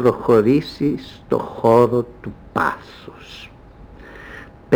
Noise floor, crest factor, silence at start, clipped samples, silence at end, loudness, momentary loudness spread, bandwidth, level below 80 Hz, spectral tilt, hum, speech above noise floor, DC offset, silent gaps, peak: -42 dBFS; 16 dB; 0 s; under 0.1%; 0 s; -18 LUFS; 24 LU; over 20 kHz; -46 dBFS; -7.5 dB/octave; none; 23 dB; under 0.1%; none; -2 dBFS